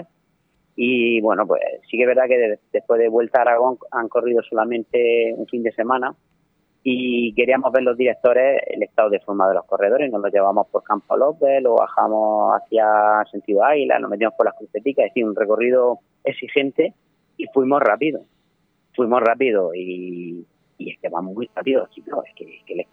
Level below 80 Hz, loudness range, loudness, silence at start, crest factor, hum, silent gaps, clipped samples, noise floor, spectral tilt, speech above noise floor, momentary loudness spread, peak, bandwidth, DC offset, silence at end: -70 dBFS; 4 LU; -19 LUFS; 0 s; 18 dB; none; none; under 0.1%; -66 dBFS; -8 dB/octave; 47 dB; 12 LU; -2 dBFS; 3.8 kHz; under 0.1%; 0.1 s